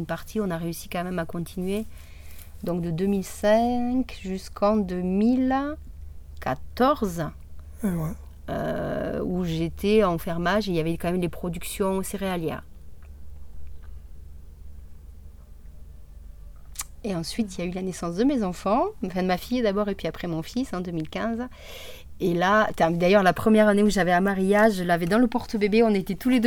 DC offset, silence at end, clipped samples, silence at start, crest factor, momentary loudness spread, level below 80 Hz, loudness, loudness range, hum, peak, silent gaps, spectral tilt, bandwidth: under 0.1%; 0 s; under 0.1%; 0 s; 18 dB; 15 LU; -44 dBFS; -25 LUFS; 12 LU; none; -8 dBFS; none; -6 dB/octave; 18.5 kHz